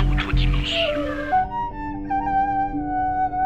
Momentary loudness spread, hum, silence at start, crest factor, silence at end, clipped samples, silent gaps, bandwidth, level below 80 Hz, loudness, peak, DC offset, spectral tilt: 5 LU; none; 0 s; 14 dB; 0 s; under 0.1%; none; 8.2 kHz; -28 dBFS; -23 LUFS; -8 dBFS; 0.8%; -6 dB/octave